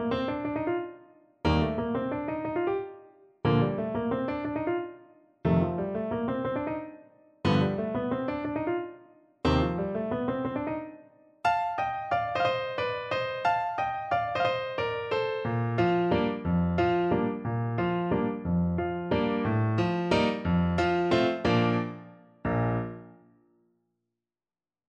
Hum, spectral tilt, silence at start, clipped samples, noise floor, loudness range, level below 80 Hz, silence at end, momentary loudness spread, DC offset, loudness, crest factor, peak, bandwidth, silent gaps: none; -8 dB/octave; 0 s; under 0.1%; under -90 dBFS; 4 LU; -48 dBFS; 1.75 s; 7 LU; under 0.1%; -29 LUFS; 18 dB; -12 dBFS; 8.4 kHz; none